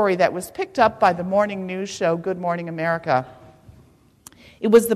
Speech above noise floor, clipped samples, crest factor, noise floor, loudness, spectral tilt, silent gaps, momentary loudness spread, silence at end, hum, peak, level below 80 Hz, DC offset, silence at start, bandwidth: 33 dB; under 0.1%; 18 dB; -53 dBFS; -21 LUFS; -5.5 dB/octave; none; 11 LU; 0 s; none; -4 dBFS; -56 dBFS; under 0.1%; 0 s; 14 kHz